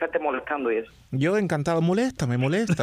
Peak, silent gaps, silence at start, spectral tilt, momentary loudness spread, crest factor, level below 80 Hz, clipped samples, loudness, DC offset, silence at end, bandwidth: -12 dBFS; none; 0 s; -6.5 dB/octave; 4 LU; 12 dB; -56 dBFS; under 0.1%; -25 LUFS; under 0.1%; 0 s; 13.5 kHz